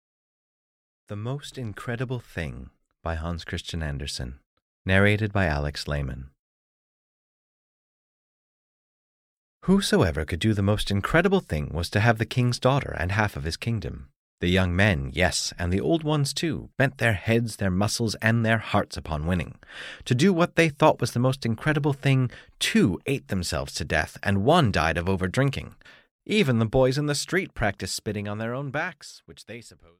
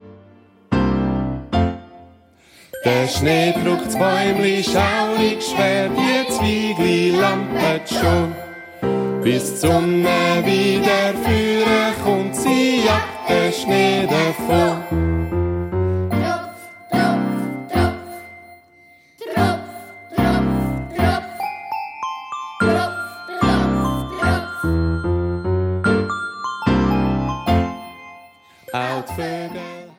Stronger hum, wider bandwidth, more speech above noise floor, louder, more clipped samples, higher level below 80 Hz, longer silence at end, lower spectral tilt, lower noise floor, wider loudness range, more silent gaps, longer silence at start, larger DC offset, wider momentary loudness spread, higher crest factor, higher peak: neither; about the same, 16 kHz vs 16.5 kHz; first, over 65 dB vs 33 dB; second, -25 LUFS vs -19 LUFS; neither; second, -42 dBFS vs -36 dBFS; first, 0.3 s vs 0.1 s; about the same, -5.5 dB/octave vs -5.5 dB/octave; first, under -90 dBFS vs -50 dBFS; first, 9 LU vs 5 LU; first, 4.46-4.85 s, 6.39-9.61 s, 14.16-14.38 s, 26.11-26.19 s vs none; first, 1.1 s vs 0.05 s; neither; about the same, 13 LU vs 11 LU; first, 20 dB vs 14 dB; about the same, -4 dBFS vs -4 dBFS